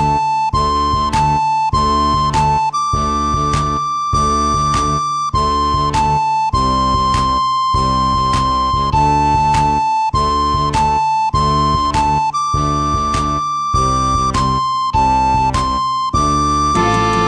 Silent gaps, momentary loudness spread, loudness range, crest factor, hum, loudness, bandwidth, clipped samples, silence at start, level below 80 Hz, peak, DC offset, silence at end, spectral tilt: none; 3 LU; 1 LU; 12 dB; none; -15 LUFS; 10.5 kHz; under 0.1%; 0 s; -26 dBFS; -2 dBFS; under 0.1%; 0 s; -5 dB/octave